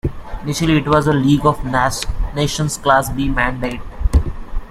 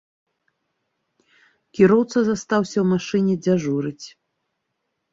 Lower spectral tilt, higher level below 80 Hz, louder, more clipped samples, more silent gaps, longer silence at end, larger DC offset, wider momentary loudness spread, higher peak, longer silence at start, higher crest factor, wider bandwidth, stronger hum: about the same, -5.5 dB/octave vs -6.5 dB/octave; first, -24 dBFS vs -60 dBFS; first, -17 LUFS vs -20 LUFS; neither; neither; second, 0 s vs 1.05 s; neither; second, 11 LU vs 17 LU; about the same, -2 dBFS vs -2 dBFS; second, 0.05 s vs 1.75 s; about the same, 16 dB vs 20 dB; first, 15.5 kHz vs 7.8 kHz; neither